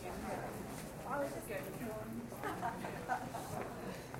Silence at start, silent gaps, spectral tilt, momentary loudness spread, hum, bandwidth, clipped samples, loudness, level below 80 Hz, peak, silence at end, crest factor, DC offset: 0 s; none; -5 dB/octave; 5 LU; none; 16 kHz; under 0.1%; -43 LUFS; -60 dBFS; -26 dBFS; 0 s; 18 dB; under 0.1%